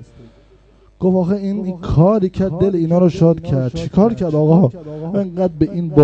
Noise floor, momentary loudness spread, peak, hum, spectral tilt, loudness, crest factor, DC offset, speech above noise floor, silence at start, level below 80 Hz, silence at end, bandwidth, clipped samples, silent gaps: -48 dBFS; 8 LU; 0 dBFS; none; -10 dB/octave; -16 LUFS; 16 dB; under 0.1%; 34 dB; 0 s; -38 dBFS; 0 s; 7.6 kHz; under 0.1%; none